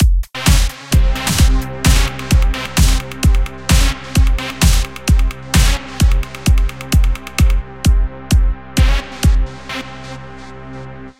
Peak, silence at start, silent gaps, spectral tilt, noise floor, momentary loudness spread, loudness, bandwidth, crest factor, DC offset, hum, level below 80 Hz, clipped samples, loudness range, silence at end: 0 dBFS; 0 s; none; -4.5 dB/octave; -33 dBFS; 12 LU; -16 LUFS; 16.5 kHz; 14 dB; 1%; none; -14 dBFS; under 0.1%; 2 LU; 0.1 s